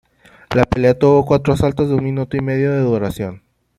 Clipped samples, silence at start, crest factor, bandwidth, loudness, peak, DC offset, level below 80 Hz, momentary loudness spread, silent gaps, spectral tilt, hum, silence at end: under 0.1%; 0.5 s; 16 dB; 14 kHz; -16 LUFS; -2 dBFS; under 0.1%; -38 dBFS; 8 LU; none; -8 dB/octave; none; 0.4 s